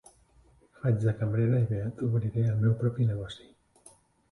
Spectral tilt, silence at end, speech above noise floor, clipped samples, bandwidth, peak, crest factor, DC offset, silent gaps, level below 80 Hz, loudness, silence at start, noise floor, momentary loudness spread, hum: -9 dB/octave; 0.95 s; 34 dB; under 0.1%; 11 kHz; -16 dBFS; 14 dB; under 0.1%; none; -56 dBFS; -29 LUFS; 0.85 s; -61 dBFS; 8 LU; none